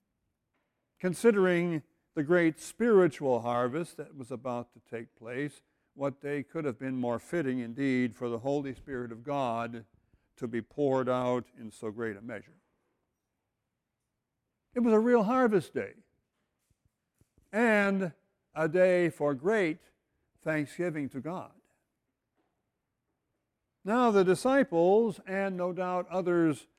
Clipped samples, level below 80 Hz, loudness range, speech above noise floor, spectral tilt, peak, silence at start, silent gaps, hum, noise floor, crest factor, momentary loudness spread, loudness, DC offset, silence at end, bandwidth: under 0.1%; -70 dBFS; 10 LU; 56 dB; -6.5 dB/octave; -12 dBFS; 1.05 s; none; none; -85 dBFS; 18 dB; 16 LU; -30 LUFS; under 0.1%; 0.15 s; 14.5 kHz